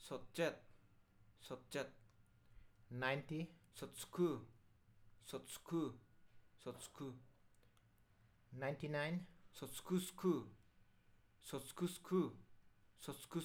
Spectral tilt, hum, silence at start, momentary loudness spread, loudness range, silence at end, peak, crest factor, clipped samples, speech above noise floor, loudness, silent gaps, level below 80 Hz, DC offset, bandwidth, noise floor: -5.5 dB/octave; none; 0 s; 18 LU; 6 LU; 0 s; -24 dBFS; 24 dB; under 0.1%; 28 dB; -46 LUFS; none; -74 dBFS; under 0.1%; 18.5 kHz; -73 dBFS